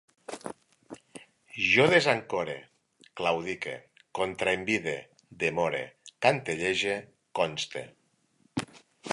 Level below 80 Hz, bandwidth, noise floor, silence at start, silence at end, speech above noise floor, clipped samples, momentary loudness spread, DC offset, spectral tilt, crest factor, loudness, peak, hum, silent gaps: -64 dBFS; 11.5 kHz; -68 dBFS; 0.3 s; 0 s; 41 dB; under 0.1%; 21 LU; under 0.1%; -4 dB/octave; 24 dB; -28 LUFS; -6 dBFS; none; none